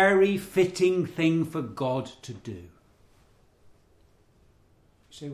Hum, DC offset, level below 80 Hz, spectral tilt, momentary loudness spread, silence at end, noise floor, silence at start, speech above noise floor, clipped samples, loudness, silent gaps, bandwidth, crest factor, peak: none; under 0.1%; -60 dBFS; -6 dB/octave; 18 LU; 0 s; -62 dBFS; 0 s; 36 dB; under 0.1%; -26 LUFS; none; 15 kHz; 18 dB; -10 dBFS